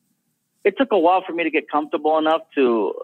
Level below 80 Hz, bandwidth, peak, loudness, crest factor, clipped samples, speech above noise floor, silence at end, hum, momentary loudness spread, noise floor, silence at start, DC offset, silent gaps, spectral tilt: -72 dBFS; 4.3 kHz; -4 dBFS; -20 LUFS; 16 dB; under 0.1%; 51 dB; 0 s; none; 6 LU; -70 dBFS; 0.65 s; under 0.1%; none; -6.5 dB/octave